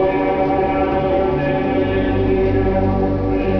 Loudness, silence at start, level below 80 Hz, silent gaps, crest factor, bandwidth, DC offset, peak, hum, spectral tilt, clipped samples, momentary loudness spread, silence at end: -17 LUFS; 0 s; -28 dBFS; none; 10 dB; 5.4 kHz; under 0.1%; -6 dBFS; none; -10 dB/octave; under 0.1%; 2 LU; 0 s